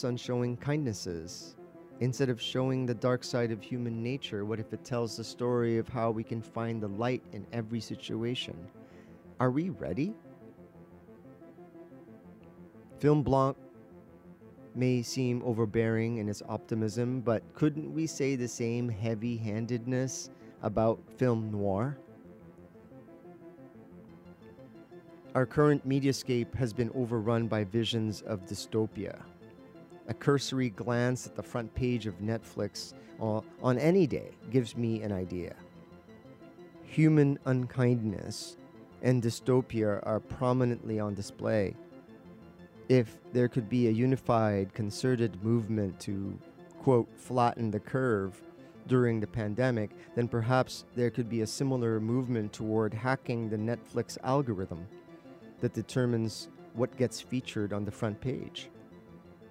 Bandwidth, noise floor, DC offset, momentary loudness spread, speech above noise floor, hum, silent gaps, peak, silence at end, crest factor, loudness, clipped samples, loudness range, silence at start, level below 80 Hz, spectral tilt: 13.5 kHz; -53 dBFS; under 0.1%; 22 LU; 23 dB; none; none; -10 dBFS; 0 s; 20 dB; -32 LUFS; under 0.1%; 5 LU; 0 s; -62 dBFS; -6.5 dB/octave